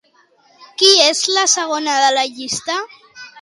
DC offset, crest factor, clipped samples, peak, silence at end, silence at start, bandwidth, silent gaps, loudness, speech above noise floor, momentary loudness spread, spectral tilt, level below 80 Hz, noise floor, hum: under 0.1%; 18 dB; under 0.1%; 0 dBFS; 0 s; 0.6 s; 16 kHz; none; -14 LUFS; 39 dB; 14 LU; 0.5 dB/octave; -66 dBFS; -54 dBFS; none